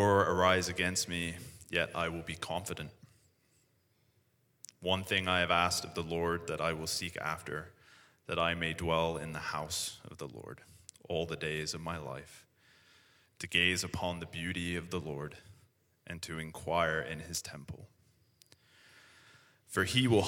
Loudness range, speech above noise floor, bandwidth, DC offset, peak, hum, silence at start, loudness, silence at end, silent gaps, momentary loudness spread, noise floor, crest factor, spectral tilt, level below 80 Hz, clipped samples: 7 LU; 39 dB; 19 kHz; under 0.1%; -12 dBFS; none; 0 s; -34 LUFS; 0 s; none; 19 LU; -73 dBFS; 24 dB; -3.5 dB/octave; -60 dBFS; under 0.1%